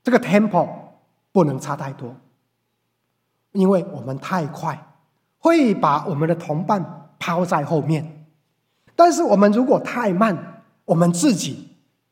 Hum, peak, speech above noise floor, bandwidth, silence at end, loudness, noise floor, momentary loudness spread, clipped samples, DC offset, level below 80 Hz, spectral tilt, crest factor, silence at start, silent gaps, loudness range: none; 0 dBFS; 54 dB; 16 kHz; 0.45 s; -19 LUFS; -72 dBFS; 15 LU; under 0.1%; under 0.1%; -70 dBFS; -6.5 dB/octave; 20 dB; 0.05 s; none; 7 LU